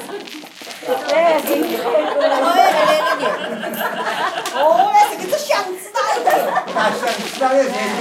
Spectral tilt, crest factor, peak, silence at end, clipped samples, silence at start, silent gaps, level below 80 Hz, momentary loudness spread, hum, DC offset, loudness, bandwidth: -2.5 dB/octave; 16 dB; -2 dBFS; 0 s; under 0.1%; 0 s; none; -72 dBFS; 10 LU; none; under 0.1%; -17 LUFS; 17 kHz